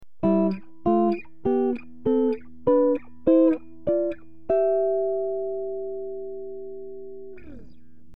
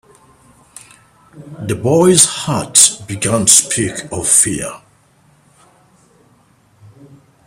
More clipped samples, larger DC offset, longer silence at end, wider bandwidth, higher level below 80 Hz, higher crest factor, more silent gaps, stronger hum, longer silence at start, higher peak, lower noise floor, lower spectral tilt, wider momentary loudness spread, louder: second, under 0.1% vs 0.1%; first, 1% vs under 0.1%; second, 0.5 s vs 2.7 s; second, 5.2 kHz vs over 20 kHz; second, -56 dBFS vs -50 dBFS; about the same, 16 dB vs 18 dB; neither; neither; second, 0 s vs 1.35 s; second, -8 dBFS vs 0 dBFS; about the same, -53 dBFS vs -52 dBFS; first, -11 dB/octave vs -3 dB/octave; first, 17 LU vs 14 LU; second, -24 LUFS vs -11 LUFS